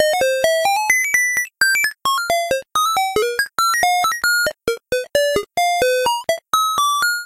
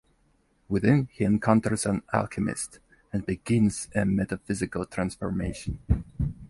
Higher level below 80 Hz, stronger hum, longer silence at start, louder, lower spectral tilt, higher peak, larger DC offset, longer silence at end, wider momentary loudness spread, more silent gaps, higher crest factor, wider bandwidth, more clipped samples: second, -52 dBFS vs -40 dBFS; neither; second, 0 s vs 0.7 s; first, -17 LUFS vs -27 LUFS; second, 0 dB/octave vs -6.5 dB/octave; about the same, -4 dBFS vs -6 dBFS; neither; about the same, 0 s vs 0.05 s; second, 5 LU vs 10 LU; neither; second, 14 dB vs 22 dB; first, 16 kHz vs 11.5 kHz; neither